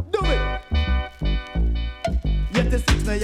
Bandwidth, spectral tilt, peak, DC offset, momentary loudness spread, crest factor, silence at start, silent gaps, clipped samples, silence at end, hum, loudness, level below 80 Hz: 12.5 kHz; -5.5 dB/octave; -6 dBFS; under 0.1%; 6 LU; 14 dB; 0 s; none; under 0.1%; 0 s; none; -24 LUFS; -24 dBFS